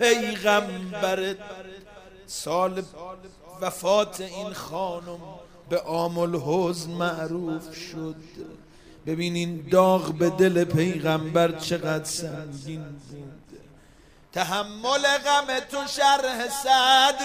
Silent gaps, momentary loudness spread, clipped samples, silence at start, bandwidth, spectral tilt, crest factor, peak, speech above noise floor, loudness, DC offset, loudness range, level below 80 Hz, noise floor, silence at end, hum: none; 20 LU; under 0.1%; 0 s; 15.5 kHz; -4 dB/octave; 20 dB; -6 dBFS; 29 dB; -24 LUFS; under 0.1%; 7 LU; -56 dBFS; -53 dBFS; 0 s; none